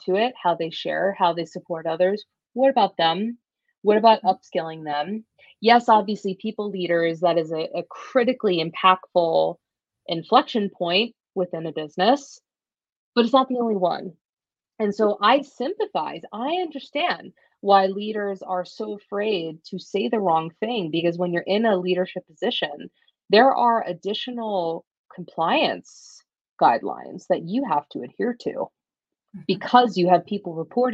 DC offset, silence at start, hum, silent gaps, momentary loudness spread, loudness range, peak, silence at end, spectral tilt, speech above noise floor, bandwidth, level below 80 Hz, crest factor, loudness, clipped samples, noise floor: under 0.1%; 0.05 s; none; 3.78-3.82 s, 12.92-13.13 s, 14.25-14.37 s, 24.87-24.91 s, 24.99-25.04 s, 26.49-26.57 s; 13 LU; 3 LU; 0 dBFS; 0 s; -6 dB/octave; over 68 dB; 7.8 kHz; -74 dBFS; 22 dB; -22 LUFS; under 0.1%; under -90 dBFS